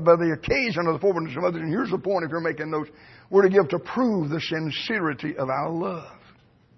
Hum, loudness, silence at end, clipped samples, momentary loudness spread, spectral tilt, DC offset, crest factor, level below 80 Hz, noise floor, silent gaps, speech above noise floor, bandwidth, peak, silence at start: none; -24 LUFS; 0.6 s; under 0.1%; 9 LU; -7 dB/octave; under 0.1%; 20 dB; -54 dBFS; -56 dBFS; none; 32 dB; 6.2 kHz; -4 dBFS; 0 s